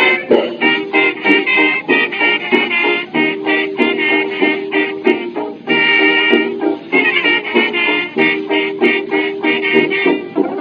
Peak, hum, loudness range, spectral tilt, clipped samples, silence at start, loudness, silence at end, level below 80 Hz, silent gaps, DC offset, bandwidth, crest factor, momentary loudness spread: 0 dBFS; none; 2 LU; -6 dB/octave; under 0.1%; 0 s; -13 LUFS; 0 s; -70 dBFS; none; under 0.1%; 5.4 kHz; 14 dB; 5 LU